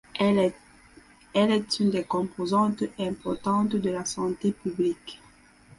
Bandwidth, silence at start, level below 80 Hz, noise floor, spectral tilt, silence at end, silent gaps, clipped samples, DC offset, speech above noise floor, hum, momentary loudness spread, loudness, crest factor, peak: 11.5 kHz; 0.15 s; -60 dBFS; -55 dBFS; -5.5 dB/octave; 0.6 s; none; under 0.1%; under 0.1%; 30 dB; none; 7 LU; -26 LUFS; 16 dB; -10 dBFS